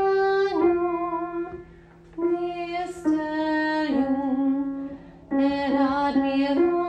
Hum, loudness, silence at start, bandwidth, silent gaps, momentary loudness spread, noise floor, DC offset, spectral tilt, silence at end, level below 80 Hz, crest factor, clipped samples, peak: none; -24 LUFS; 0 s; 9 kHz; none; 11 LU; -49 dBFS; under 0.1%; -6 dB/octave; 0 s; -54 dBFS; 14 dB; under 0.1%; -10 dBFS